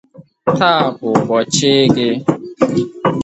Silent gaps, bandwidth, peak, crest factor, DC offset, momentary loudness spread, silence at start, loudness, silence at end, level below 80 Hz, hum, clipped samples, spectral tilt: none; 8.8 kHz; 0 dBFS; 14 dB; under 0.1%; 7 LU; 0.2 s; -15 LUFS; 0 s; -52 dBFS; none; under 0.1%; -4.5 dB/octave